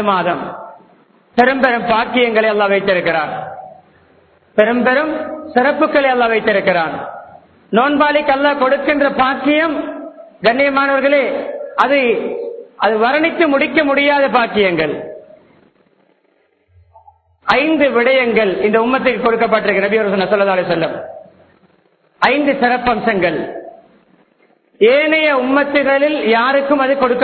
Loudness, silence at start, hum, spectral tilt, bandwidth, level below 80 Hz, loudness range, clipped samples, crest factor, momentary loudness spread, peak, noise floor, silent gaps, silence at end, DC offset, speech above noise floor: -14 LUFS; 0 s; none; -7 dB/octave; 6.4 kHz; -52 dBFS; 4 LU; under 0.1%; 16 dB; 11 LU; 0 dBFS; -59 dBFS; none; 0 s; under 0.1%; 45 dB